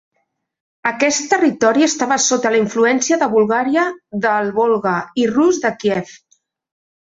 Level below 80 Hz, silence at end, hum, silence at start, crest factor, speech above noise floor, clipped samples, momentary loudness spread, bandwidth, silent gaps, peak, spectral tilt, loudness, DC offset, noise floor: -62 dBFS; 0.95 s; none; 0.85 s; 14 dB; 54 dB; under 0.1%; 6 LU; 8 kHz; none; -2 dBFS; -3.5 dB/octave; -16 LUFS; under 0.1%; -70 dBFS